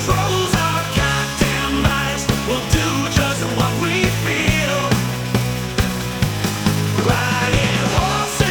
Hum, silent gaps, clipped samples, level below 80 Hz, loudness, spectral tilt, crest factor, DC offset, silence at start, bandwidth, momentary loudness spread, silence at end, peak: none; none; under 0.1%; -30 dBFS; -18 LUFS; -4.5 dB/octave; 18 dB; under 0.1%; 0 s; 19.5 kHz; 4 LU; 0 s; 0 dBFS